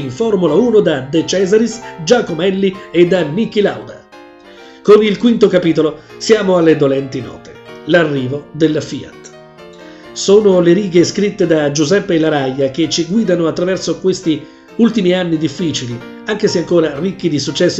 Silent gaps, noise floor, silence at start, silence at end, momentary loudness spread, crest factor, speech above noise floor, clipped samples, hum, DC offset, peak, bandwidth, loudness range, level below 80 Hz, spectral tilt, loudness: none; -38 dBFS; 0 s; 0 s; 12 LU; 14 dB; 25 dB; under 0.1%; none; under 0.1%; 0 dBFS; 8.2 kHz; 3 LU; -50 dBFS; -5.5 dB/octave; -13 LUFS